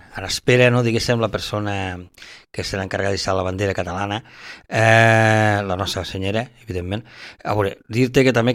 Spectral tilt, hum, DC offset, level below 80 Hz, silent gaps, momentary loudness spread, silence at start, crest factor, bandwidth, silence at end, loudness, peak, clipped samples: -5.5 dB/octave; none; under 0.1%; -48 dBFS; none; 15 LU; 0.1 s; 20 dB; 15.5 kHz; 0 s; -19 LUFS; 0 dBFS; under 0.1%